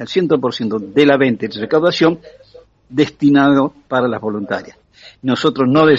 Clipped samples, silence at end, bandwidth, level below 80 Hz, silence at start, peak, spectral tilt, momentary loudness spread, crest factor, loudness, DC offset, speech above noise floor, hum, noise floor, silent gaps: under 0.1%; 0 s; 7.6 kHz; -54 dBFS; 0 s; 0 dBFS; -4.5 dB/octave; 11 LU; 14 dB; -15 LUFS; under 0.1%; 30 dB; none; -45 dBFS; none